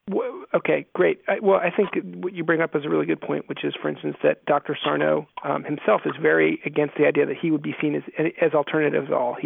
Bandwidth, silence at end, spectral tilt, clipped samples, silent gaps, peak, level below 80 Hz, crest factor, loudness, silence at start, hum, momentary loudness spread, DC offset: 3.9 kHz; 0 s; -10 dB/octave; under 0.1%; none; -6 dBFS; -74 dBFS; 16 dB; -23 LUFS; 0.05 s; none; 7 LU; under 0.1%